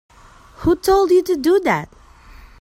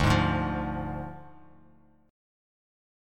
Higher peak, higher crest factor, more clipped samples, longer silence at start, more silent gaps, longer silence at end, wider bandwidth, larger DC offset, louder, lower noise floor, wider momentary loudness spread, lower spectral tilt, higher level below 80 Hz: first, -4 dBFS vs -10 dBFS; second, 16 dB vs 22 dB; neither; first, 0.6 s vs 0 s; neither; second, 0.15 s vs 1 s; about the same, 16.5 kHz vs 16.5 kHz; neither; first, -17 LUFS vs -29 LUFS; second, -43 dBFS vs -60 dBFS; second, 9 LU vs 17 LU; about the same, -5.5 dB/octave vs -6.5 dB/octave; about the same, -40 dBFS vs -42 dBFS